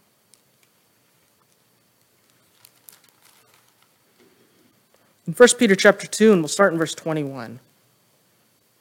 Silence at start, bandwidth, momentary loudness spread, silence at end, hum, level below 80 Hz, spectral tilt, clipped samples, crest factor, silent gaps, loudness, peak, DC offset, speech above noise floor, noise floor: 5.25 s; 17 kHz; 20 LU; 1.25 s; none; -70 dBFS; -4 dB/octave; under 0.1%; 24 dB; none; -17 LUFS; 0 dBFS; under 0.1%; 45 dB; -62 dBFS